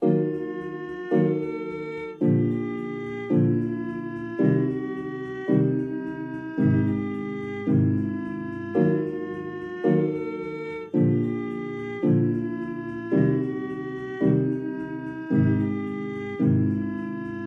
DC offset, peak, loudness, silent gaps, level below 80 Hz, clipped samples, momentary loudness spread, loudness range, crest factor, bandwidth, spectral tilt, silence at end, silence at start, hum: under 0.1%; -8 dBFS; -26 LUFS; none; -58 dBFS; under 0.1%; 10 LU; 1 LU; 16 dB; 6 kHz; -10.5 dB/octave; 0 s; 0 s; none